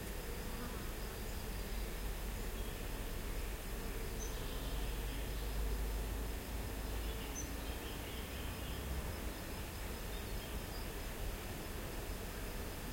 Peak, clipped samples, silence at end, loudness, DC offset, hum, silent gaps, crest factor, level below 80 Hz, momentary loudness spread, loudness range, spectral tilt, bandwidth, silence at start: -28 dBFS; under 0.1%; 0 s; -44 LUFS; under 0.1%; none; none; 14 dB; -44 dBFS; 2 LU; 2 LU; -4 dB/octave; 16.5 kHz; 0 s